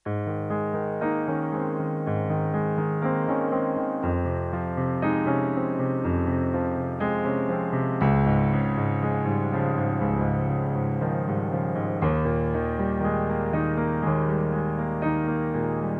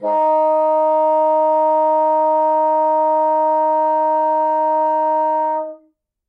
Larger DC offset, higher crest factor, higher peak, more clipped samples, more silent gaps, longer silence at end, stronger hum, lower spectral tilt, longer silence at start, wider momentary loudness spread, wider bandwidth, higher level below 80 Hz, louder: neither; first, 16 dB vs 8 dB; about the same, -8 dBFS vs -8 dBFS; neither; neither; second, 0 s vs 0.55 s; neither; first, -11 dB/octave vs -6 dB/octave; about the same, 0.05 s vs 0 s; about the same, 4 LU vs 2 LU; first, 4.1 kHz vs 3.6 kHz; first, -44 dBFS vs under -90 dBFS; second, -26 LUFS vs -16 LUFS